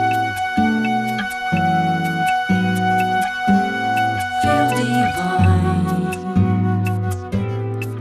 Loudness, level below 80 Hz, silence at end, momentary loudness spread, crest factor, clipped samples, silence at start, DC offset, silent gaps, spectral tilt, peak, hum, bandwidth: -19 LUFS; -44 dBFS; 0 s; 6 LU; 14 dB; under 0.1%; 0 s; under 0.1%; none; -6 dB/octave; -4 dBFS; none; 14 kHz